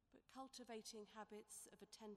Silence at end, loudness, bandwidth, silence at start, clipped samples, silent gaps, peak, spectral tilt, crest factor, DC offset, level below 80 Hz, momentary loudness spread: 0 s; -58 LUFS; 15.5 kHz; 0.1 s; under 0.1%; none; -42 dBFS; -2.5 dB/octave; 16 dB; under 0.1%; -88 dBFS; 5 LU